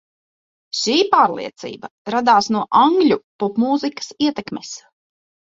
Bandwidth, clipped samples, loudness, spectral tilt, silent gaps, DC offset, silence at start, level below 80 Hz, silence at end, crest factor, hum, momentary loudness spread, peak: 7.8 kHz; under 0.1%; -17 LUFS; -4 dB/octave; 1.91-2.05 s, 3.24-3.39 s; under 0.1%; 0.75 s; -64 dBFS; 0.7 s; 18 dB; none; 17 LU; -2 dBFS